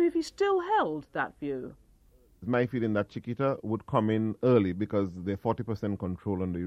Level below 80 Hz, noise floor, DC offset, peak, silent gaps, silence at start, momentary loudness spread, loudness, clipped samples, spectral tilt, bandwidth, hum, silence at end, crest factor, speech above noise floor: -60 dBFS; -61 dBFS; under 0.1%; -10 dBFS; none; 0 s; 9 LU; -30 LUFS; under 0.1%; -8 dB/octave; 11.5 kHz; none; 0 s; 20 dB; 32 dB